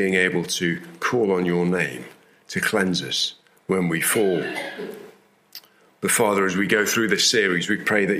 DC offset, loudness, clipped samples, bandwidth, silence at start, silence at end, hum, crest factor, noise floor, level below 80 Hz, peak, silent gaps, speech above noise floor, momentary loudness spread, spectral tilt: under 0.1%; -21 LUFS; under 0.1%; 16 kHz; 0 s; 0 s; none; 18 dB; -51 dBFS; -66 dBFS; -4 dBFS; none; 30 dB; 13 LU; -3.5 dB/octave